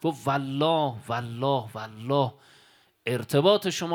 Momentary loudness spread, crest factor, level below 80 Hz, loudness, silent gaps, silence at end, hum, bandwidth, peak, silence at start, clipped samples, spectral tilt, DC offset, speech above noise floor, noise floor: 10 LU; 20 dB; -68 dBFS; -26 LUFS; none; 0 s; none; 18.5 kHz; -6 dBFS; 0 s; under 0.1%; -5.5 dB/octave; under 0.1%; 34 dB; -60 dBFS